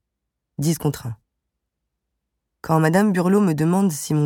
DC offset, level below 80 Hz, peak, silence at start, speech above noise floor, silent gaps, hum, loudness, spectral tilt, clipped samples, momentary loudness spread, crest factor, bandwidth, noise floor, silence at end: under 0.1%; -56 dBFS; -4 dBFS; 0.6 s; 62 dB; none; none; -20 LUFS; -6.5 dB/octave; under 0.1%; 19 LU; 18 dB; 17.5 kHz; -80 dBFS; 0 s